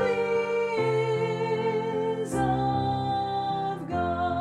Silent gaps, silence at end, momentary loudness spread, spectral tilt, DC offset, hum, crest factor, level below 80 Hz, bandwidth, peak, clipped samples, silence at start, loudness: none; 0 s; 3 LU; -6.5 dB/octave; under 0.1%; none; 14 dB; -52 dBFS; 12 kHz; -14 dBFS; under 0.1%; 0 s; -27 LUFS